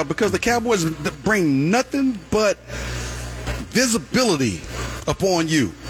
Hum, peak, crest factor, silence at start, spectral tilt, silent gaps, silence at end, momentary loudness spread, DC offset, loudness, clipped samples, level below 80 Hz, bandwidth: none; -4 dBFS; 16 dB; 0 s; -4.5 dB/octave; none; 0 s; 11 LU; under 0.1%; -21 LUFS; under 0.1%; -38 dBFS; 18.5 kHz